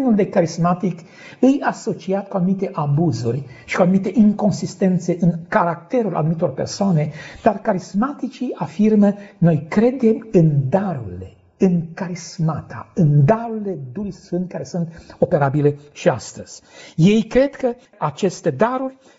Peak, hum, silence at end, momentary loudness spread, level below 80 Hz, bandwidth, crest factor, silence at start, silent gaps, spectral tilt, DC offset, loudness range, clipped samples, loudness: -2 dBFS; none; 0.25 s; 12 LU; -50 dBFS; 8 kHz; 16 dB; 0 s; none; -7.5 dB/octave; under 0.1%; 3 LU; under 0.1%; -19 LUFS